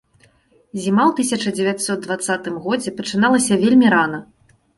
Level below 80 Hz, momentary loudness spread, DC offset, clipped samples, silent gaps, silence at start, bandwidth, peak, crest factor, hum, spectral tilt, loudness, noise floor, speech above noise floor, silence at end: -58 dBFS; 10 LU; under 0.1%; under 0.1%; none; 0.75 s; 11.5 kHz; -2 dBFS; 16 dB; none; -4.5 dB/octave; -18 LUFS; -56 dBFS; 39 dB; 0.55 s